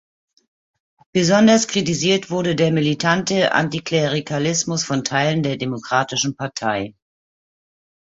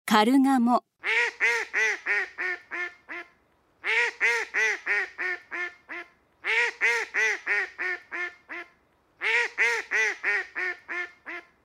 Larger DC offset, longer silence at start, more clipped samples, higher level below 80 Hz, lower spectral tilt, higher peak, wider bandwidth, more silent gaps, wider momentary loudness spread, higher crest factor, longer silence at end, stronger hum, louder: neither; first, 1.15 s vs 0.05 s; neither; first, -56 dBFS vs -76 dBFS; first, -4 dB/octave vs -2.5 dB/octave; first, -2 dBFS vs -6 dBFS; second, 8 kHz vs 16 kHz; neither; second, 9 LU vs 15 LU; about the same, 18 dB vs 22 dB; first, 1.2 s vs 0.25 s; neither; first, -19 LUFS vs -25 LUFS